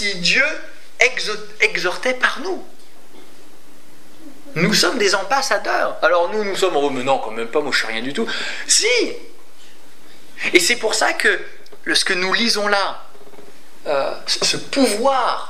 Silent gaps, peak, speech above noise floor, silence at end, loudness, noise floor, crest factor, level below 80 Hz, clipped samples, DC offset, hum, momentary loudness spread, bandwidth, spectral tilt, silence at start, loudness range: none; 0 dBFS; 29 dB; 0 s; -18 LUFS; -48 dBFS; 20 dB; -68 dBFS; under 0.1%; 5%; none; 10 LU; 16 kHz; -2 dB/octave; 0 s; 4 LU